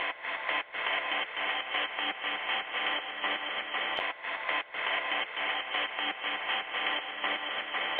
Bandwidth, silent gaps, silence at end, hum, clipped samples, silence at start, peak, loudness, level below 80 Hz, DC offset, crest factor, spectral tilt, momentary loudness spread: 5 kHz; none; 0 s; none; under 0.1%; 0 s; -16 dBFS; -31 LUFS; -76 dBFS; under 0.1%; 18 dB; -3.5 dB/octave; 2 LU